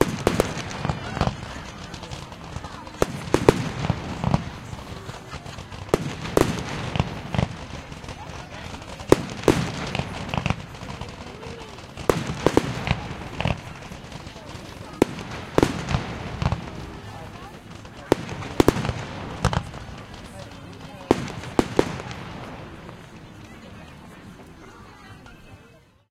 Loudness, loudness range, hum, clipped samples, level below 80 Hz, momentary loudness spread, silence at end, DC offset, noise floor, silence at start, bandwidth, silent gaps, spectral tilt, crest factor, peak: -26 LUFS; 3 LU; none; under 0.1%; -40 dBFS; 20 LU; 0.3 s; under 0.1%; -52 dBFS; 0 s; 16 kHz; none; -5.5 dB/octave; 28 dB; 0 dBFS